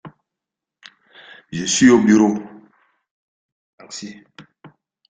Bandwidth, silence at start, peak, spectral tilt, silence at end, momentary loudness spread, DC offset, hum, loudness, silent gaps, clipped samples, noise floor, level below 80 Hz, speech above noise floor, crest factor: 9.4 kHz; 0.05 s; -2 dBFS; -4 dB/octave; 0.7 s; 23 LU; under 0.1%; none; -15 LUFS; 3.11-3.78 s; under 0.1%; -85 dBFS; -60 dBFS; 70 dB; 20 dB